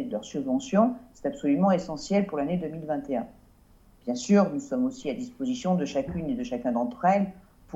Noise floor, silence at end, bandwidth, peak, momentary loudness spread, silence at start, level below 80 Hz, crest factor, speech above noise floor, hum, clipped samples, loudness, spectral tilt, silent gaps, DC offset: -57 dBFS; 0 s; 8.2 kHz; -10 dBFS; 11 LU; 0 s; -56 dBFS; 18 dB; 30 dB; none; under 0.1%; -27 LUFS; -6.5 dB/octave; none; under 0.1%